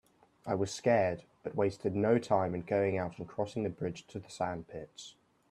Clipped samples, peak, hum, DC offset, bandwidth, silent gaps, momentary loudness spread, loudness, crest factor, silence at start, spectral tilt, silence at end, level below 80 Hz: under 0.1%; -14 dBFS; none; under 0.1%; 12.5 kHz; none; 17 LU; -33 LUFS; 20 dB; 0.45 s; -6.5 dB/octave; 0.4 s; -66 dBFS